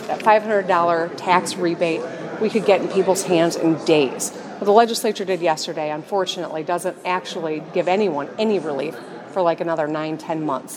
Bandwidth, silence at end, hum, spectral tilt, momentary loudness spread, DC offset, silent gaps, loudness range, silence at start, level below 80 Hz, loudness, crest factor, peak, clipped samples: 16.5 kHz; 0 s; none; -4.5 dB/octave; 9 LU; under 0.1%; none; 4 LU; 0 s; -76 dBFS; -20 LUFS; 20 dB; 0 dBFS; under 0.1%